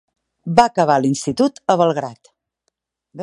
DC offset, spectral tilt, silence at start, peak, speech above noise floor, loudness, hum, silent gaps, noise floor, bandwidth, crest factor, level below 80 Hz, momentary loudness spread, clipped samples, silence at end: under 0.1%; -5.5 dB/octave; 0.45 s; 0 dBFS; 57 dB; -17 LUFS; none; none; -74 dBFS; 11.5 kHz; 18 dB; -56 dBFS; 11 LU; under 0.1%; 0 s